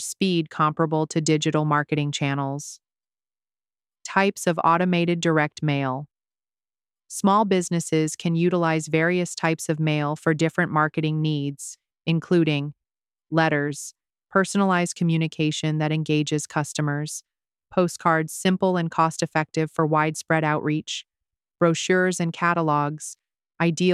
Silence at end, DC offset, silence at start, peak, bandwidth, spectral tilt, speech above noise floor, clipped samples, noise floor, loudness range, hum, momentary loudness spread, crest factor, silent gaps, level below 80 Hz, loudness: 0 s; under 0.1%; 0 s; -4 dBFS; 14 kHz; -5.5 dB/octave; over 68 dB; under 0.1%; under -90 dBFS; 2 LU; none; 8 LU; 20 dB; none; -68 dBFS; -23 LUFS